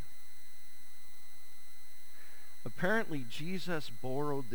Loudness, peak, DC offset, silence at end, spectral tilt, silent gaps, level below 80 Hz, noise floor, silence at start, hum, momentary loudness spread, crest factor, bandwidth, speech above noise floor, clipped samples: -37 LUFS; -18 dBFS; 3%; 0 s; -5.5 dB/octave; none; -76 dBFS; -60 dBFS; 0 s; none; 23 LU; 22 dB; over 20 kHz; 23 dB; under 0.1%